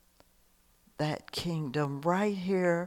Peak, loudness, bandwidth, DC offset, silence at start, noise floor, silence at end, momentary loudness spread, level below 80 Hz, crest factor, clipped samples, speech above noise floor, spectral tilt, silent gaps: -14 dBFS; -32 LUFS; 16.5 kHz; under 0.1%; 1 s; -66 dBFS; 0 s; 6 LU; -64 dBFS; 18 dB; under 0.1%; 35 dB; -6.5 dB/octave; none